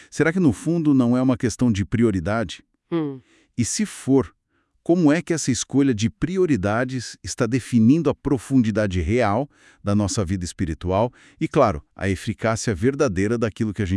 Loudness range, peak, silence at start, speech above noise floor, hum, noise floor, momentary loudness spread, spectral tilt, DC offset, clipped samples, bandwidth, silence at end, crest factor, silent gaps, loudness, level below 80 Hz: 3 LU; -4 dBFS; 0.15 s; 41 dB; none; -61 dBFS; 9 LU; -6 dB/octave; under 0.1%; under 0.1%; 12 kHz; 0 s; 16 dB; none; -22 LUFS; -46 dBFS